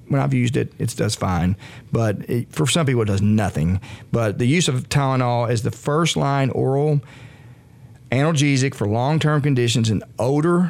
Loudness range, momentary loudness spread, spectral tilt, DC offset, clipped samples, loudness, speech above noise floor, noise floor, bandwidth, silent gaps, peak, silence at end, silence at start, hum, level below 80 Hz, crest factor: 1 LU; 6 LU; -5.5 dB/octave; under 0.1%; under 0.1%; -20 LUFS; 26 dB; -45 dBFS; 15 kHz; none; -4 dBFS; 0 s; 0.05 s; none; -50 dBFS; 14 dB